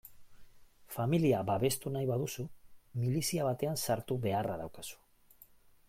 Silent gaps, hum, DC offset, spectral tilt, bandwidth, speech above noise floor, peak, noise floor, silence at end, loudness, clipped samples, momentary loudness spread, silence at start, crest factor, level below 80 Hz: none; none; under 0.1%; -5.5 dB/octave; 16.5 kHz; 28 dB; -18 dBFS; -61 dBFS; 0.95 s; -34 LUFS; under 0.1%; 14 LU; 0.05 s; 16 dB; -64 dBFS